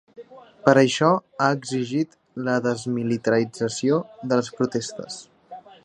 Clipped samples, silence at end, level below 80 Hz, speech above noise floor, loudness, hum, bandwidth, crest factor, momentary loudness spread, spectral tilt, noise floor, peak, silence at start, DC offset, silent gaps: under 0.1%; 0.25 s; -68 dBFS; 22 dB; -23 LUFS; none; 11 kHz; 22 dB; 14 LU; -5.5 dB/octave; -44 dBFS; 0 dBFS; 0.2 s; under 0.1%; none